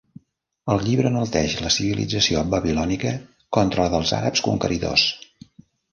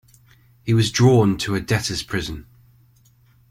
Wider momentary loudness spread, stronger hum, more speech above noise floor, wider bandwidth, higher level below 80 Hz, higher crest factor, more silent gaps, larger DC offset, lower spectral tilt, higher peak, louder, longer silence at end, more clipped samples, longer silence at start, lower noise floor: second, 6 LU vs 17 LU; neither; first, 41 dB vs 37 dB; second, 10.5 kHz vs 15.5 kHz; about the same, -42 dBFS vs -46 dBFS; about the same, 20 dB vs 18 dB; neither; neither; about the same, -4.5 dB/octave vs -5.5 dB/octave; about the same, -2 dBFS vs -2 dBFS; about the same, -21 LUFS vs -19 LUFS; second, 0.75 s vs 1.1 s; neither; about the same, 0.65 s vs 0.65 s; first, -62 dBFS vs -55 dBFS